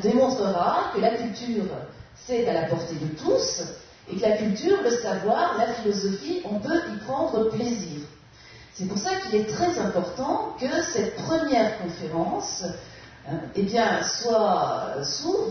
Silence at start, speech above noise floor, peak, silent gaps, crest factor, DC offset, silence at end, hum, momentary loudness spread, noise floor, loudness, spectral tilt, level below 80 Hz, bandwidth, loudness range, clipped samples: 0 s; 23 dB; -8 dBFS; none; 16 dB; under 0.1%; 0 s; none; 12 LU; -48 dBFS; -25 LUFS; -4.5 dB/octave; -56 dBFS; 6.6 kHz; 3 LU; under 0.1%